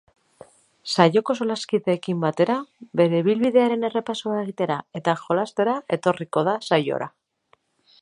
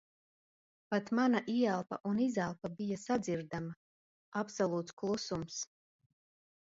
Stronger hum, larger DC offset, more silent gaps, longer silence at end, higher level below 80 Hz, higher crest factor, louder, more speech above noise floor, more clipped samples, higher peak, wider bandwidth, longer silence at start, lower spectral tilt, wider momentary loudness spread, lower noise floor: neither; neither; second, none vs 2.00-2.04 s, 3.76-4.32 s, 4.93-4.97 s; about the same, 0.95 s vs 1.05 s; about the same, -70 dBFS vs -72 dBFS; about the same, 22 dB vs 20 dB; first, -23 LUFS vs -36 LUFS; second, 42 dB vs over 55 dB; neither; first, 0 dBFS vs -18 dBFS; first, 11.5 kHz vs 8 kHz; about the same, 0.85 s vs 0.9 s; about the same, -6 dB/octave vs -5.5 dB/octave; second, 8 LU vs 11 LU; second, -64 dBFS vs under -90 dBFS